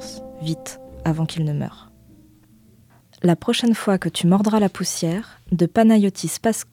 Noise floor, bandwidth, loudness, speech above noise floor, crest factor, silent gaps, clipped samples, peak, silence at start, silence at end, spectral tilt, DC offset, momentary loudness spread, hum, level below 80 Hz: -53 dBFS; 16 kHz; -20 LUFS; 33 dB; 16 dB; none; under 0.1%; -6 dBFS; 0 s; 0.1 s; -5.5 dB/octave; under 0.1%; 13 LU; none; -52 dBFS